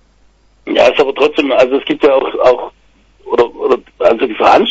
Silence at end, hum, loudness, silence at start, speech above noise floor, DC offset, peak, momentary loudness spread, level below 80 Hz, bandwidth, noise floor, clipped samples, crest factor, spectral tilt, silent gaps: 0 s; none; -12 LUFS; 0.65 s; 39 dB; under 0.1%; 0 dBFS; 8 LU; -46 dBFS; 8 kHz; -50 dBFS; under 0.1%; 12 dB; -4.5 dB/octave; none